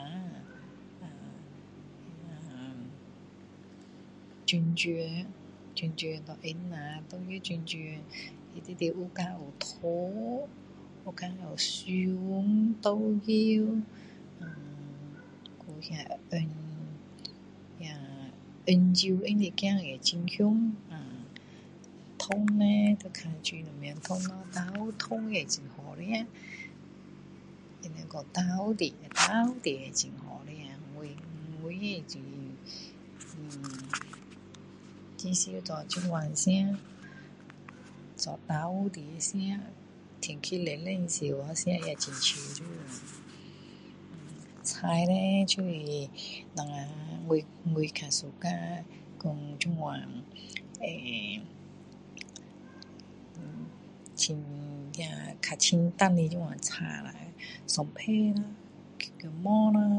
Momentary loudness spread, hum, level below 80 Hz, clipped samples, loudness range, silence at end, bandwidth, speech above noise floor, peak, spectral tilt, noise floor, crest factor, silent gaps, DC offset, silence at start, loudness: 23 LU; none; -70 dBFS; under 0.1%; 11 LU; 0 s; 11 kHz; 20 dB; -8 dBFS; -4.5 dB/octave; -52 dBFS; 26 dB; none; under 0.1%; 0 s; -32 LUFS